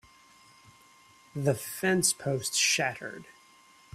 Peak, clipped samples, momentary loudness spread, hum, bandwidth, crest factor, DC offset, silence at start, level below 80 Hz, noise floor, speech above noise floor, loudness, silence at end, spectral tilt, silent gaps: -10 dBFS; under 0.1%; 17 LU; none; 16 kHz; 22 dB; under 0.1%; 1.35 s; -68 dBFS; -58 dBFS; 29 dB; -27 LUFS; 0.65 s; -3 dB/octave; none